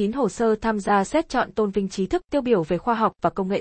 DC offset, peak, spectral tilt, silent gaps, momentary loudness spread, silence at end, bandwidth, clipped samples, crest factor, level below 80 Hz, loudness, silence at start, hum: under 0.1%; -6 dBFS; -6 dB/octave; none; 4 LU; 0 s; 8.8 kHz; under 0.1%; 16 dB; -48 dBFS; -23 LUFS; 0 s; none